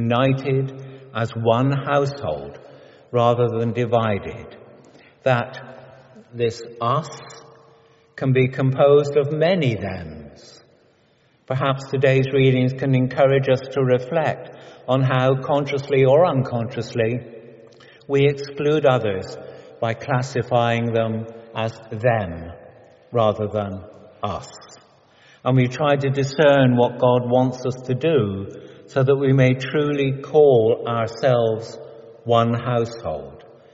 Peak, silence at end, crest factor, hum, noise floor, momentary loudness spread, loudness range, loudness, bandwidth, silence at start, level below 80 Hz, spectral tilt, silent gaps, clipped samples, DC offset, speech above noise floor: -2 dBFS; 0.3 s; 18 dB; none; -59 dBFS; 17 LU; 6 LU; -20 LUFS; 7.8 kHz; 0 s; -56 dBFS; -6 dB/octave; none; under 0.1%; under 0.1%; 40 dB